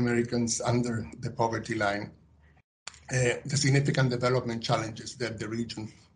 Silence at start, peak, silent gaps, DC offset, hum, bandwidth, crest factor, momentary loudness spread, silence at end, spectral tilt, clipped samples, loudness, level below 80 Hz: 0 s; -12 dBFS; 2.64-2.86 s; under 0.1%; none; 10.5 kHz; 18 dB; 13 LU; 0.25 s; -5 dB/octave; under 0.1%; -29 LUFS; -58 dBFS